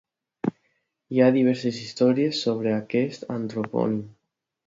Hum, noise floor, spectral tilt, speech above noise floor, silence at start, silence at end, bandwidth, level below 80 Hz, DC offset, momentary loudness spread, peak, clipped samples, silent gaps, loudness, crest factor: none; -79 dBFS; -6.5 dB/octave; 56 dB; 0.45 s; 0.55 s; 7.8 kHz; -68 dBFS; under 0.1%; 11 LU; -6 dBFS; under 0.1%; none; -24 LUFS; 18 dB